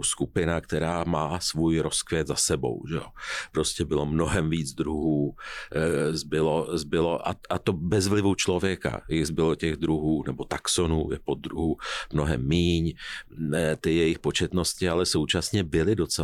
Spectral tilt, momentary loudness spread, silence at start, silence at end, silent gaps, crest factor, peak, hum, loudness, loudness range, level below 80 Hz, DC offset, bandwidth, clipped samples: -4.5 dB/octave; 7 LU; 0 s; 0 s; none; 14 dB; -12 dBFS; none; -26 LUFS; 2 LU; -42 dBFS; under 0.1%; 15 kHz; under 0.1%